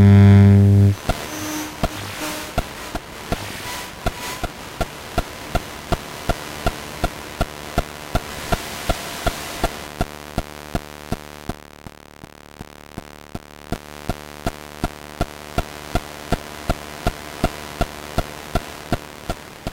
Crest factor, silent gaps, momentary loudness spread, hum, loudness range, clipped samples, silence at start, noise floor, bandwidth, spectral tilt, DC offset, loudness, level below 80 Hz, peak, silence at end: 20 dB; none; 10 LU; none; 8 LU; under 0.1%; 0 s; -42 dBFS; 16.5 kHz; -6 dB/octave; under 0.1%; -23 LUFS; -32 dBFS; -2 dBFS; 0 s